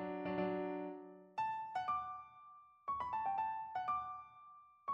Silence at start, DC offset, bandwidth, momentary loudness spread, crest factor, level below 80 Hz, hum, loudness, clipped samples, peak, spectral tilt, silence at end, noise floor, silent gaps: 0 s; under 0.1%; 7.8 kHz; 18 LU; 16 dB; -74 dBFS; none; -42 LUFS; under 0.1%; -28 dBFS; -7.5 dB/octave; 0 s; -61 dBFS; none